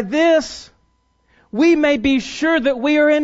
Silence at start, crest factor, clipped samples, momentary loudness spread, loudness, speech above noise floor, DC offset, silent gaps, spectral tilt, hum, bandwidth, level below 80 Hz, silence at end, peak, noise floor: 0 s; 12 dB; under 0.1%; 12 LU; -16 LUFS; 46 dB; under 0.1%; none; -4 dB/octave; none; 8 kHz; -48 dBFS; 0 s; -4 dBFS; -62 dBFS